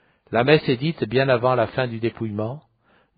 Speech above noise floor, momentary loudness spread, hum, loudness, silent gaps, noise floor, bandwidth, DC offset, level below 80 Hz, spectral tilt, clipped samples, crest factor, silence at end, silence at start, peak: 41 dB; 11 LU; none; -21 LUFS; none; -61 dBFS; 5 kHz; under 0.1%; -56 dBFS; -5 dB/octave; under 0.1%; 20 dB; 0.6 s; 0.3 s; -2 dBFS